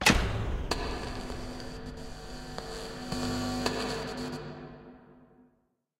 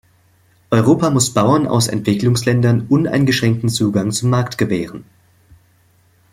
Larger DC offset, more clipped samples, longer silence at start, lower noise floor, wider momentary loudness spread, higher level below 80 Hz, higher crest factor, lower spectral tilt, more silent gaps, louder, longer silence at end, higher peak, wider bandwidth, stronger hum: neither; neither; second, 0 s vs 0.7 s; first, -73 dBFS vs -55 dBFS; first, 13 LU vs 5 LU; first, -42 dBFS vs -50 dBFS; first, 26 dB vs 14 dB; second, -4 dB/octave vs -5.5 dB/octave; neither; second, -34 LUFS vs -16 LUFS; second, 0.6 s vs 1.3 s; second, -8 dBFS vs -2 dBFS; about the same, 16 kHz vs 15.5 kHz; neither